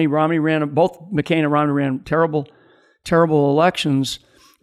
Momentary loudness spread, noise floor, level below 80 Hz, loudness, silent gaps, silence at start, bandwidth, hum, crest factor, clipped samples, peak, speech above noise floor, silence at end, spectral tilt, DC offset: 10 LU; -52 dBFS; -52 dBFS; -18 LUFS; none; 0 s; 13.5 kHz; none; 14 dB; under 0.1%; -4 dBFS; 35 dB; 0.45 s; -6.5 dB/octave; under 0.1%